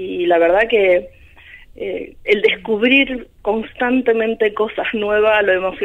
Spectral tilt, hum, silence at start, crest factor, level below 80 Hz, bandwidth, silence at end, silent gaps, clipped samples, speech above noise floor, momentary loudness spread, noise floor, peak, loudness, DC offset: -6 dB/octave; none; 0 s; 16 dB; -46 dBFS; 5.8 kHz; 0 s; none; under 0.1%; 26 dB; 11 LU; -42 dBFS; 0 dBFS; -16 LUFS; under 0.1%